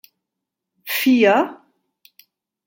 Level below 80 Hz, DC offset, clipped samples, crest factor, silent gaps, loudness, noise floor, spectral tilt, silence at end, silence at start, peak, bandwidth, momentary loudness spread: -76 dBFS; under 0.1%; under 0.1%; 20 dB; none; -17 LUFS; -82 dBFS; -4 dB/octave; 1.1 s; 0.85 s; -2 dBFS; 17 kHz; 14 LU